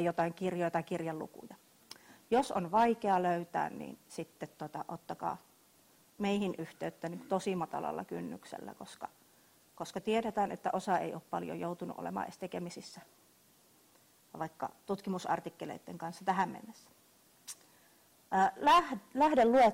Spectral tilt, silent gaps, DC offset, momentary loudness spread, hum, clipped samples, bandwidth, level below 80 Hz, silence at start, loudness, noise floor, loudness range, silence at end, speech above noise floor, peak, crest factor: -5.5 dB/octave; none; under 0.1%; 19 LU; none; under 0.1%; 16 kHz; -72 dBFS; 0 s; -35 LUFS; -66 dBFS; 8 LU; 0 s; 32 dB; -16 dBFS; 18 dB